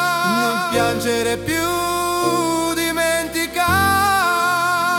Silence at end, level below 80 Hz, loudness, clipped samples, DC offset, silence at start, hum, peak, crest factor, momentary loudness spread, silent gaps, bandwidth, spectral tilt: 0 s; -46 dBFS; -18 LUFS; under 0.1%; under 0.1%; 0 s; none; -4 dBFS; 16 dB; 5 LU; none; 18 kHz; -3 dB/octave